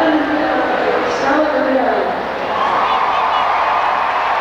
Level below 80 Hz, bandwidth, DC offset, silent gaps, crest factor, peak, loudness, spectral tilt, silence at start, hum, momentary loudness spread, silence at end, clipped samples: -48 dBFS; 13.5 kHz; under 0.1%; none; 12 dB; -4 dBFS; -15 LUFS; -4.5 dB/octave; 0 s; none; 3 LU; 0 s; under 0.1%